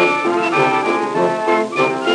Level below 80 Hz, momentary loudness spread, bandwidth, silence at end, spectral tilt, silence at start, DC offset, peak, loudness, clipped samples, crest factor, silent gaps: -78 dBFS; 2 LU; 11 kHz; 0 s; -5 dB/octave; 0 s; under 0.1%; -4 dBFS; -16 LUFS; under 0.1%; 12 dB; none